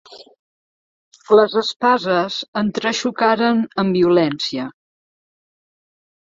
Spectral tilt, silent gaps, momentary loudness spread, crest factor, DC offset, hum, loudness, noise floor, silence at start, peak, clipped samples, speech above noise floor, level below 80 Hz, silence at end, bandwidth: -5 dB/octave; 0.39-1.11 s, 1.76-1.80 s, 2.48-2.53 s; 8 LU; 18 dB; under 0.1%; none; -17 LUFS; under -90 dBFS; 0.1 s; -2 dBFS; under 0.1%; over 73 dB; -60 dBFS; 1.6 s; 7.8 kHz